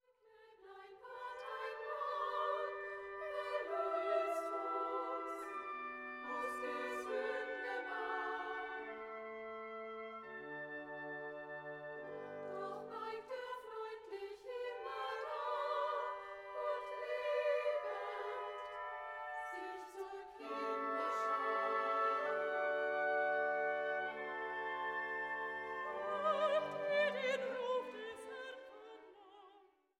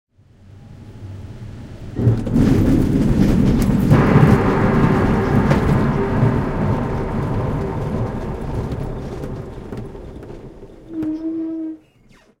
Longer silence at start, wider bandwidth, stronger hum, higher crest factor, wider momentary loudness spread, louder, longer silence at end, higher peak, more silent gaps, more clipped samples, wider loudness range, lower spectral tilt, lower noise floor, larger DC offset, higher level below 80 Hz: second, 0.25 s vs 0.55 s; second, 14 kHz vs 16.5 kHz; neither; about the same, 18 dB vs 18 dB; second, 12 LU vs 21 LU; second, -41 LUFS vs -18 LUFS; second, 0.35 s vs 0.65 s; second, -24 dBFS vs 0 dBFS; neither; neither; second, 9 LU vs 13 LU; second, -3.5 dB/octave vs -8.5 dB/octave; first, -68 dBFS vs -51 dBFS; neither; second, -82 dBFS vs -28 dBFS